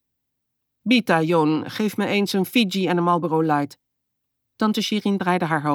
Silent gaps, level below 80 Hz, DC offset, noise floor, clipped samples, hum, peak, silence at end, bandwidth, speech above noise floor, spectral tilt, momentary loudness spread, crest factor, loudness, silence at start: none; -74 dBFS; under 0.1%; -78 dBFS; under 0.1%; none; -6 dBFS; 0 s; 18.5 kHz; 57 dB; -5.5 dB/octave; 6 LU; 16 dB; -21 LUFS; 0.85 s